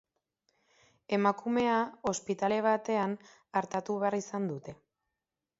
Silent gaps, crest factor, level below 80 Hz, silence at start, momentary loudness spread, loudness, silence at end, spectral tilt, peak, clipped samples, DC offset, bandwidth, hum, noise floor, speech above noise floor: none; 20 dB; -72 dBFS; 1.1 s; 8 LU; -31 LUFS; 0.85 s; -5 dB/octave; -12 dBFS; under 0.1%; under 0.1%; 8 kHz; none; -89 dBFS; 58 dB